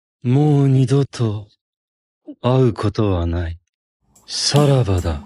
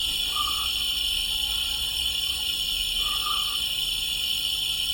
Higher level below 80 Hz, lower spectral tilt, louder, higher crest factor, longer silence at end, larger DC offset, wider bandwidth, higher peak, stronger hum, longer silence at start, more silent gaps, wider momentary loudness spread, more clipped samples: first, -36 dBFS vs -44 dBFS; first, -6.5 dB/octave vs 0.5 dB/octave; first, -17 LUFS vs -24 LUFS; about the same, 16 dB vs 14 dB; about the same, 0 s vs 0 s; neither; second, 11.5 kHz vs 17.5 kHz; first, -2 dBFS vs -14 dBFS; neither; first, 0.25 s vs 0 s; first, 1.61-2.21 s, 3.69-4.00 s vs none; first, 11 LU vs 1 LU; neither